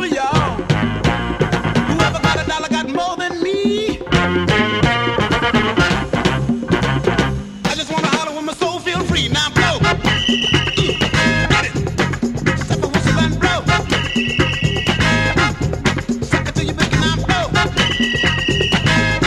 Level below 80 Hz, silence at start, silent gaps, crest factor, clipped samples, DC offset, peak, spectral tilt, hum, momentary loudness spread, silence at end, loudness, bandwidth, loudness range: -30 dBFS; 0 s; none; 16 dB; under 0.1%; under 0.1%; 0 dBFS; -5 dB/octave; none; 5 LU; 0 s; -16 LUFS; 13.5 kHz; 2 LU